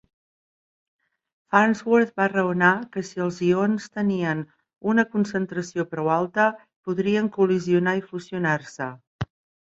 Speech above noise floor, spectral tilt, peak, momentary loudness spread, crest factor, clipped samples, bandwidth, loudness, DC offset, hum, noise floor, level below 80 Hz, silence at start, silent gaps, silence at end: over 67 dB; -6.5 dB/octave; -2 dBFS; 14 LU; 22 dB; under 0.1%; 8 kHz; -23 LUFS; under 0.1%; none; under -90 dBFS; -60 dBFS; 1.5 s; 6.76-6.83 s, 9.07-9.19 s; 0.4 s